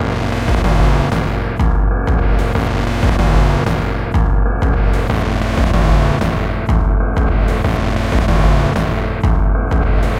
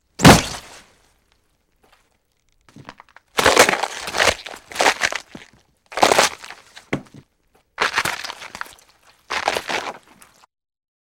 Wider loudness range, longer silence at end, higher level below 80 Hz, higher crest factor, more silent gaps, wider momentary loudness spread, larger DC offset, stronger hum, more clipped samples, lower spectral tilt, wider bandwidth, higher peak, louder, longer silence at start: second, 1 LU vs 7 LU; second, 0 s vs 1.05 s; first, -16 dBFS vs -42 dBFS; second, 14 dB vs 22 dB; neither; second, 4 LU vs 21 LU; neither; neither; neither; first, -7 dB/octave vs -3.5 dB/octave; second, 10.5 kHz vs 17 kHz; about the same, 0 dBFS vs 0 dBFS; about the same, -16 LUFS vs -18 LUFS; second, 0 s vs 0.2 s